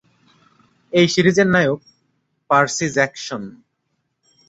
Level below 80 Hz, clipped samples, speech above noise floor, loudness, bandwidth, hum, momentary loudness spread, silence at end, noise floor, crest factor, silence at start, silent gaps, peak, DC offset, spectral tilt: -58 dBFS; under 0.1%; 55 dB; -17 LUFS; 8.2 kHz; none; 14 LU; 0.95 s; -72 dBFS; 18 dB; 0.95 s; none; -2 dBFS; under 0.1%; -4.5 dB/octave